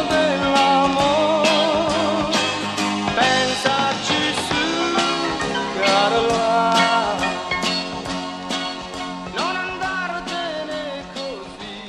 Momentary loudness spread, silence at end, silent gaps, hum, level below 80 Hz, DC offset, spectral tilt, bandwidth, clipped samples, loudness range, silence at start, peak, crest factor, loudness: 11 LU; 0 s; none; none; -48 dBFS; under 0.1%; -3.5 dB/octave; 14.5 kHz; under 0.1%; 7 LU; 0 s; -2 dBFS; 18 dB; -20 LUFS